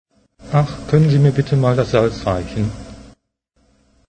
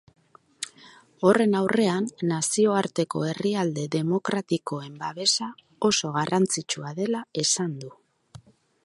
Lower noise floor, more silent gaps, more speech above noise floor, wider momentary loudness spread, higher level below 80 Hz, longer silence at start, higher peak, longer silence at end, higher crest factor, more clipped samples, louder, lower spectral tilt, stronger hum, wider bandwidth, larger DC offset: first, -64 dBFS vs -53 dBFS; neither; first, 48 dB vs 28 dB; second, 10 LU vs 13 LU; first, -40 dBFS vs -70 dBFS; second, 0.4 s vs 0.6 s; first, 0 dBFS vs -4 dBFS; first, 1 s vs 0.5 s; about the same, 18 dB vs 22 dB; neither; first, -17 LUFS vs -25 LUFS; first, -8 dB/octave vs -4 dB/octave; neither; second, 9.2 kHz vs 11.5 kHz; neither